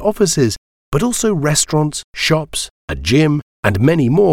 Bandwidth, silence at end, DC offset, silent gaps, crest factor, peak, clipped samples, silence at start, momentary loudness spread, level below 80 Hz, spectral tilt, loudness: 16.5 kHz; 0 s; under 0.1%; 0.58-0.92 s, 2.04-2.13 s, 2.70-2.88 s, 3.42-3.63 s; 14 dB; 0 dBFS; under 0.1%; 0 s; 9 LU; -38 dBFS; -4.5 dB/octave; -16 LUFS